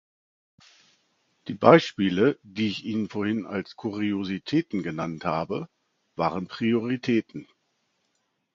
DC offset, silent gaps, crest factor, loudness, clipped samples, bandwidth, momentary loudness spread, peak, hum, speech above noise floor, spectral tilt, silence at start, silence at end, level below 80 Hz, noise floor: under 0.1%; none; 26 dB; -25 LUFS; under 0.1%; 7.4 kHz; 15 LU; 0 dBFS; none; 50 dB; -7 dB/octave; 1.45 s; 1.1 s; -62 dBFS; -75 dBFS